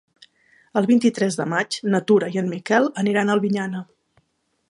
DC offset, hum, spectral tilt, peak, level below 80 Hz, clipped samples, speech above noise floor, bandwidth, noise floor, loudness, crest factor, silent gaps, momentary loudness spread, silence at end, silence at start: under 0.1%; none; -5.5 dB/octave; -4 dBFS; -70 dBFS; under 0.1%; 49 dB; 11.5 kHz; -69 dBFS; -21 LUFS; 18 dB; none; 8 LU; 0.85 s; 0.75 s